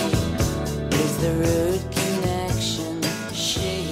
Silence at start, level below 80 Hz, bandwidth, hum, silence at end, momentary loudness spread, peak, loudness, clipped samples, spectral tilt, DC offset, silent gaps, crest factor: 0 s; -38 dBFS; 16 kHz; none; 0 s; 4 LU; -8 dBFS; -23 LUFS; under 0.1%; -4.5 dB/octave; under 0.1%; none; 16 dB